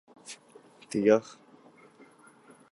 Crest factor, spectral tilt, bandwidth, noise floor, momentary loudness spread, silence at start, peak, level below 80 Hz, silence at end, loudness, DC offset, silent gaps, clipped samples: 24 dB; -5.5 dB/octave; 11.5 kHz; -57 dBFS; 23 LU; 0.3 s; -8 dBFS; -76 dBFS; 1.5 s; -26 LUFS; under 0.1%; none; under 0.1%